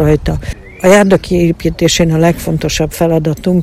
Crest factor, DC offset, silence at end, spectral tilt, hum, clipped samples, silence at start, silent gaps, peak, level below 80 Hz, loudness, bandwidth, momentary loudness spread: 12 dB; under 0.1%; 0 s; -5.5 dB/octave; none; 0.7%; 0 s; none; 0 dBFS; -26 dBFS; -12 LUFS; 15.5 kHz; 8 LU